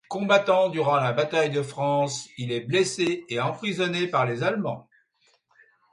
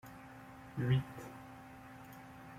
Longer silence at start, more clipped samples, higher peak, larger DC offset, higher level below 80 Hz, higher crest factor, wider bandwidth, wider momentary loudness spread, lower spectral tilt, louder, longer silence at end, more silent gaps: about the same, 0.1 s vs 0.05 s; neither; first, -6 dBFS vs -22 dBFS; neither; about the same, -68 dBFS vs -66 dBFS; about the same, 20 dB vs 20 dB; second, 11.5 kHz vs 15.5 kHz; second, 8 LU vs 19 LU; second, -5 dB/octave vs -7.5 dB/octave; first, -24 LUFS vs -38 LUFS; first, 1.1 s vs 0 s; neither